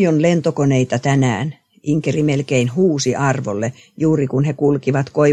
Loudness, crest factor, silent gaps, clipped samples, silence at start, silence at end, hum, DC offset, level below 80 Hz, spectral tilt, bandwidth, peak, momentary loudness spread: -17 LUFS; 14 dB; none; under 0.1%; 0 s; 0 s; none; under 0.1%; -56 dBFS; -6.5 dB/octave; 9.4 kHz; -2 dBFS; 7 LU